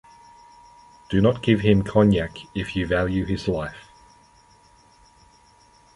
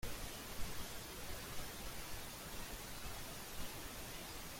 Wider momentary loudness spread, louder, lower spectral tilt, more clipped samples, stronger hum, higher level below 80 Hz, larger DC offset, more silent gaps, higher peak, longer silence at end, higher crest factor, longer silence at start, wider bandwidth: first, 11 LU vs 1 LU; first, -22 LUFS vs -48 LUFS; first, -7.5 dB/octave vs -2.5 dB/octave; neither; neither; first, -42 dBFS vs -54 dBFS; neither; neither; first, -4 dBFS vs -28 dBFS; first, 2.15 s vs 0 s; about the same, 22 dB vs 18 dB; first, 1.1 s vs 0 s; second, 11 kHz vs 16.5 kHz